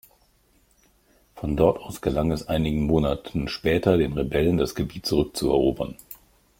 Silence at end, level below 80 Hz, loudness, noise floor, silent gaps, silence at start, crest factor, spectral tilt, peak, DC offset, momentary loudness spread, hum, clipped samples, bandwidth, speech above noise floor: 0.45 s; -40 dBFS; -24 LUFS; -62 dBFS; none; 1.35 s; 20 dB; -6.5 dB/octave; -4 dBFS; under 0.1%; 11 LU; none; under 0.1%; 16.5 kHz; 39 dB